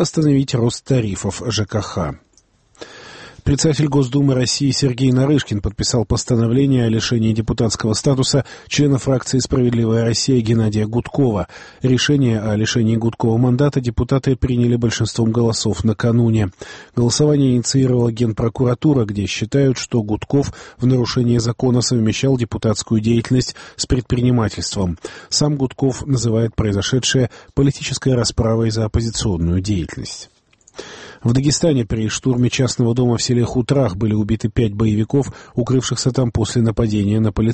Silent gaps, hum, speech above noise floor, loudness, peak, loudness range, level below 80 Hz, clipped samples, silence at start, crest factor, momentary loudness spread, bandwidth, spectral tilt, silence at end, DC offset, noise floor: none; none; 39 dB; -17 LUFS; -4 dBFS; 3 LU; -36 dBFS; under 0.1%; 0 s; 14 dB; 7 LU; 8.8 kHz; -5.5 dB/octave; 0 s; under 0.1%; -56 dBFS